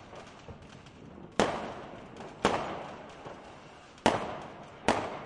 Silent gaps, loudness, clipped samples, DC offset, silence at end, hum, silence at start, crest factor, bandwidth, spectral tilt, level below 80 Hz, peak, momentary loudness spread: none; -33 LUFS; under 0.1%; under 0.1%; 0 s; none; 0 s; 28 dB; 11.5 kHz; -4.5 dB/octave; -58 dBFS; -8 dBFS; 20 LU